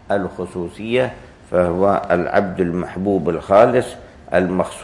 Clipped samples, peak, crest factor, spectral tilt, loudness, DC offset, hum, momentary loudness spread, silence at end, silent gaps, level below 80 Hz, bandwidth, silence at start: under 0.1%; 0 dBFS; 18 dB; -7 dB/octave; -18 LUFS; under 0.1%; none; 13 LU; 0 s; none; -48 dBFS; 11.5 kHz; 0.1 s